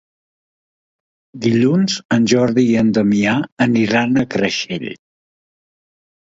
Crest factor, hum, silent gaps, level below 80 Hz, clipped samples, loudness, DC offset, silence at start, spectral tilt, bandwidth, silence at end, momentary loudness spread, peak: 18 dB; none; 2.05-2.09 s, 3.52-3.57 s; -54 dBFS; under 0.1%; -16 LUFS; under 0.1%; 1.35 s; -5.5 dB/octave; 7.8 kHz; 1.45 s; 7 LU; 0 dBFS